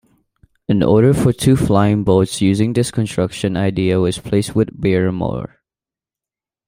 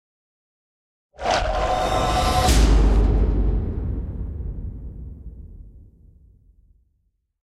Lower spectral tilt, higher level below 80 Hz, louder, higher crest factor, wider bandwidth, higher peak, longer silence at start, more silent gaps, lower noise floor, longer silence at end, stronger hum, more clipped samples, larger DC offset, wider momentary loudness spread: first, -6.5 dB/octave vs -5 dB/octave; second, -42 dBFS vs -24 dBFS; first, -16 LUFS vs -22 LUFS; about the same, 14 dB vs 18 dB; first, 16 kHz vs 14 kHz; about the same, -2 dBFS vs -4 dBFS; second, 0.7 s vs 1.2 s; neither; first, -90 dBFS vs -70 dBFS; second, 1.2 s vs 1.65 s; neither; neither; neither; second, 7 LU vs 21 LU